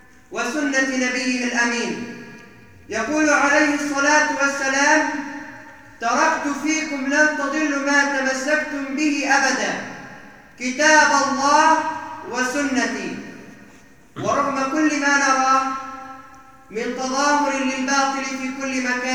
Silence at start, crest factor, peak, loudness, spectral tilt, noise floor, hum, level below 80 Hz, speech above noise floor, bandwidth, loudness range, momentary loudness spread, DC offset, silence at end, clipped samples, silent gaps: 0.3 s; 20 dB; -2 dBFS; -19 LUFS; -2 dB/octave; -49 dBFS; none; -60 dBFS; 29 dB; 13.5 kHz; 4 LU; 15 LU; 0.2%; 0 s; under 0.1%; none